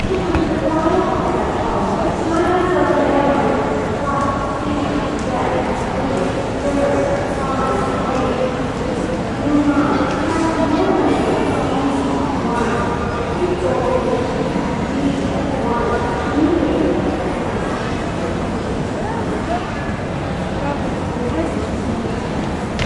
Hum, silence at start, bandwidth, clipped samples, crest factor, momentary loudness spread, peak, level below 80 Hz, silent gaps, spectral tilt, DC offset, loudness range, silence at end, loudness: none; 0 s; 11.5 kHz; under 0.1%; 14 dB; 6 LU; -4 dBFS; -32 dBFS; none; -6.5 dB/octave; under 0.1%; 4 LU; 0 s; -18 LUFS